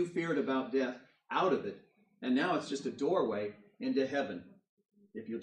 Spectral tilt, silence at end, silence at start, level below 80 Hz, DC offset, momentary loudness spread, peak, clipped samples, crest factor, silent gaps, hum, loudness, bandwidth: -5.5 dB/octave; 0 s; 0 s; -84 dBFS; under 0.1%; 14 LU; -18 dBFS; under 0.1%; 16 dB; 4.69-4.77 s; none; -34 LUFS; 9.6 kHz